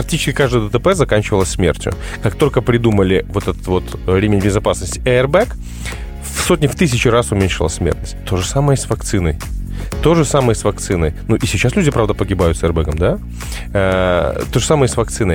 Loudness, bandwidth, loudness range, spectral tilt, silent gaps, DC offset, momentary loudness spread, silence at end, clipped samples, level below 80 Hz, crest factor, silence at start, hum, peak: -16 LUFS; 18 kHz; 2 LU; -5.5 dB/octave; none; under 0.1%; 8 LU; 0 s; under 0.1%; -26 dBFS; 16 dB; 0 s; none; 0 dBFS